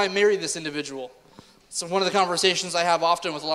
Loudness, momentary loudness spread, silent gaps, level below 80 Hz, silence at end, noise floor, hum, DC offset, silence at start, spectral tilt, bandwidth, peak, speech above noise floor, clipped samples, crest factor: -23 LUFS; 13 LU; none; -66 dBFS; 0 s; -52 dBFS; none; under 0.1%; 0 s; -2.5 dB/octave; 14.5 kHz; -4 dBFS; 28 dB; under 0.1%; 20 dB